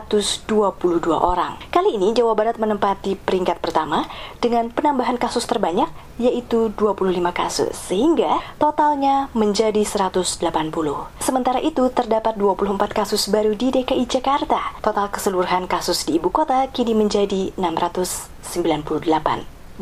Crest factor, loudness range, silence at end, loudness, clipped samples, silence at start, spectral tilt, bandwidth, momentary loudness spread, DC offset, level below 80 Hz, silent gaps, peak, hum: 18 dB; 2 LU; 0 s; -20 LUFS; under 0.1%; 0 s; -4.5 dB/octave; 16 kHz; 5 LU; under 0.1%; -42 dBFS; none; -2 dBFS; none